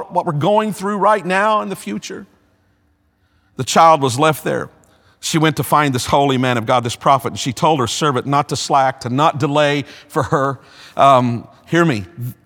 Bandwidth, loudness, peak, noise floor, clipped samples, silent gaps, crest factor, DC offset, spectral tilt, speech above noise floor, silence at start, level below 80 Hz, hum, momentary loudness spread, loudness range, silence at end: 19 kHz; -16 LUFS; 0 dBFS; -60 dBFS; under 0.1%; none; 16 dB; under 0.1%; -5 dB/octave; 44 dB; 0 s; -52 dBFS; none; 14 LU; 2 LU; 0.15 s